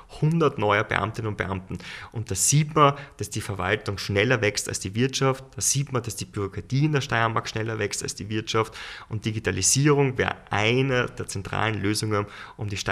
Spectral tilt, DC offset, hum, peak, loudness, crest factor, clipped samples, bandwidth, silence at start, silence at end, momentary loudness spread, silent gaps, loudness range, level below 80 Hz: -4 dB/octave; under 0.1%; none; -2 dBFS; -24 LUFS; 22 dB; under 0.1%; 15.5 kHz; 0.1 s; 0 s; 12 LU; none; 3 LU; -52 dBFS